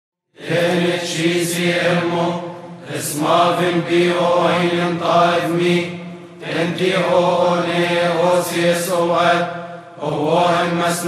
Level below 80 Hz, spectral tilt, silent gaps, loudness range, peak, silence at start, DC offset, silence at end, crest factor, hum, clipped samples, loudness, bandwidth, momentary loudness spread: -66 dBFS; -5 dB/octave; none; 2 LU; -2 dBFS; 0.4 s; under 0.1%; 0 s; 14 dB; none; under 0.1%; -17 LUFS; 14.5 kHz; 12 LU